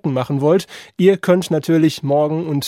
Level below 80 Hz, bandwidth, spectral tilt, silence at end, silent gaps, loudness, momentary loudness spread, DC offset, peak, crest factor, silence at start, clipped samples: -62 dBFS; 16 kHz; -6.5 dB/octave; 0 s; none; -16 LUFS; 4 LU; under 0.1%; -2 dBFS; 14 dB; 0.05 s; under 0.1%